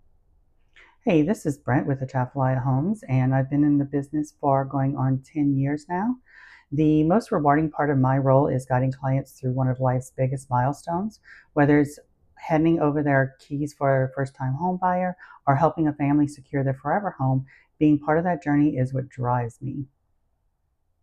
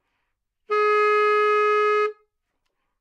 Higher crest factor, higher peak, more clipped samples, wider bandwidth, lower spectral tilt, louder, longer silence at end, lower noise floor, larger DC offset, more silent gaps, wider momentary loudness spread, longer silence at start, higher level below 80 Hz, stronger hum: first, 18 dB vs 10 dB; first, -6 dBFS vs -12 dBFS; neither; first, 11 kHz vs 8 kHz; first, -9 dB/octave vs -0.5 dB/octave; second, -24 LUFS vs -20 LUFS; first, 1.15 s vs 0.9 s; second, -71 dBFS vs -76 dBFS; neither; neither; first, 9 LU vs 6 LU; first, 1.05 s vs 0.7 s; first, -52 dBFS vs -84 dBFS; neither